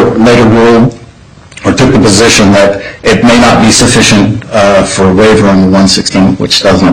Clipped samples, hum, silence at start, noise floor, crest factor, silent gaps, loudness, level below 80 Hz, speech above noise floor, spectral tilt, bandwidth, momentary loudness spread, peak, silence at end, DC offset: 1%; none; 0 s; -33 dBFS; 6 dB; none; -5 LUFS; -28 dBFS; 28 dB; -4.5 dB/octave; 16.5 kHz; 6 LU; 0 dBFS; 0 s; under 0.1%